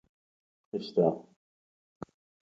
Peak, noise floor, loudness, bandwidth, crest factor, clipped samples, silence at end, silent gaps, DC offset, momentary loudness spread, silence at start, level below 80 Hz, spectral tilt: -12 dBFS; under -90 dBFS; -30 LUFS; 7.4 kHz; 22 dB; under 0.1%; 0.5 s; 1.36-2.00 s; under 0.1%; 21 LU; 0.75 s; -74 dBFS; -8.5 dB/octave